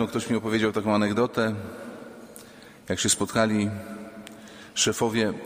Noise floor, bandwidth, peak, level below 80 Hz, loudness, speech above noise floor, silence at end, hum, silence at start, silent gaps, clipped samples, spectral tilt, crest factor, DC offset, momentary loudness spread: -47 dBFS; 15.5 kHz; -6 dBFS; -58 dBFS; -25 LUFS; 22 dB; 0 s; none; 0 s; none; under 0.1%; -4 dB/octave; 20 dB; under 0.1%; 21 LU